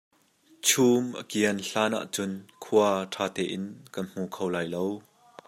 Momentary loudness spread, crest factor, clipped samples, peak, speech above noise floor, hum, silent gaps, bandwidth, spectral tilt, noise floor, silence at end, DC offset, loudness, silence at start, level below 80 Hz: 14 LU; 22 dB; under 0.1%; -6 dBFS; 34 dB; none; none; 16 kHz; -3.5 dB/octave; -62 dBFS; 0.5 s; under 0.1%; -27 LUFS; 0.65 s; -74 dBFS